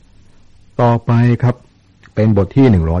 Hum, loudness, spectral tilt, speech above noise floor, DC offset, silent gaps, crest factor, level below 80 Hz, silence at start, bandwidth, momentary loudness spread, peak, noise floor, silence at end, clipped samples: none; -13 LUFS; -10 dB/octave; 34 dB; under 0.1%; none; 12 dB; -32 dBFS; 0.8 s; 6.2 kHz; 14 LU; -2 dBFS; -45 dBFS; 0 s; under 0.1%